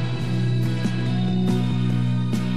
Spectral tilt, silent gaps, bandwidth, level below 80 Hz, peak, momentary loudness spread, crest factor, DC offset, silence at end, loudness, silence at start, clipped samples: -7.5 dB/octave; none; 11.5 kHz; -52 dBFS; -10 dBFS; 2 LU; 12 dB; 3%; 0 s; -23 LUFS; 0 s; under 0.1%